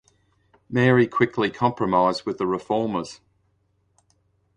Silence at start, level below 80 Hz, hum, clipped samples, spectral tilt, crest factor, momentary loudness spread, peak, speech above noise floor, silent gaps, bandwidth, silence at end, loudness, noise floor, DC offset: 0.7 s; -58 dBFS; none; under 0.1%; -7 dB/octave; 20 dB; 9 LU; -4 dBFS; 46 dB; none; 10 kHz; 1.4 s; -22 LUFS; -67 dBFS; under 0.1%